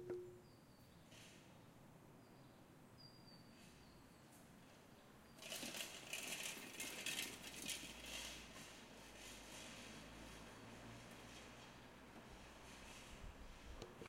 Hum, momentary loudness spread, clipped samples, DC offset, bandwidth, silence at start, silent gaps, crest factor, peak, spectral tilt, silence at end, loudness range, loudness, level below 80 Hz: none; 17 LU; under 0.1%; under 0.1%; 16 kHz; 0 s; none; 24 dB; -32 dBFS; -2 dB/octave; 0 s; 15 LU; -53 LUFS; -68 dBFS